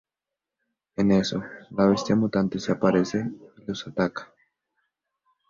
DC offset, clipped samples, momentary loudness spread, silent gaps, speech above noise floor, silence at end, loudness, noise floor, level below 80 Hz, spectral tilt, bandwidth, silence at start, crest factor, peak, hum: under 0.1%; under 0.1%; 13 LU; none; 64 dB; 1.25 s; -25 LUFS; -88 dBFS; -58 dBFS; -6.5 dB/octave; 7.6 kHz; 1 s; 20 dB; -6 dBFS; none